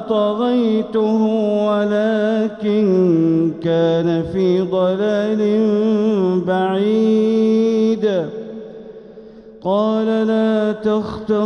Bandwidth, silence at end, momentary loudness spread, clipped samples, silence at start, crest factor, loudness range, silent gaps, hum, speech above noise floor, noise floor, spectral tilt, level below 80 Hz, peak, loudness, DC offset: 6.6 kHz; 0 s; 6 LU; under 0.1%; 0 s; 10 dB; 3 LU; none; none; 23 dB; -39 dBFS; -8 dB/octave; -54 dBFS; -6 dBFS; -17 LUFS; under 0.1%